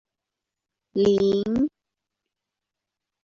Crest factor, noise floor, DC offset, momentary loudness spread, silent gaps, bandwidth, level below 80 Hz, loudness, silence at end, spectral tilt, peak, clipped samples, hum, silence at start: 18 dB; -86 dBFS; under 0.1%; 9 LU; none; 7.4 kHz; -58 dBFS; -23 LUFS; 1.55 s; -7 dB/octave; -10 dBFS; under 0.1%; none; 0.95 s